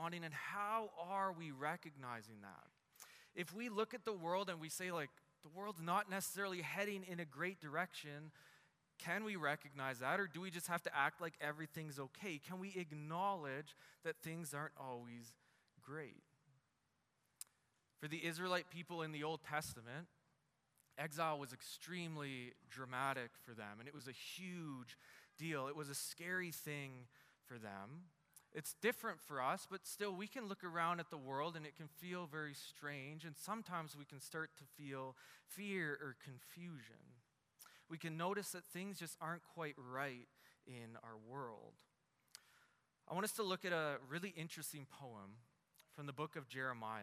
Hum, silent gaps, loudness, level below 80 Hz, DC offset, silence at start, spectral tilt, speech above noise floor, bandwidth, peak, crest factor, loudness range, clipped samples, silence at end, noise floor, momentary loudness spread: none; none; -46 LUFS; under -90 dBFS; under 0.1%; 0 s; -4 dB/octave; 38 dB; 15.5 kHz; -24 dBFS; 24 dB; 6 LU; under 0.1%; 0 s; -84 dBFS; 16 LU